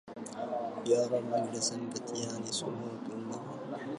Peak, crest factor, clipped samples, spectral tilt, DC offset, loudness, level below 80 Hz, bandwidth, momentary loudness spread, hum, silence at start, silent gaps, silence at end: -16 dBFS; 18 dB; under 0.1%; -4 dB/octave; under 0.1%; -35 LUFS; -78 dBFS; 11.5 kHz; 11 LU; none; 0.05 s; none; 0 s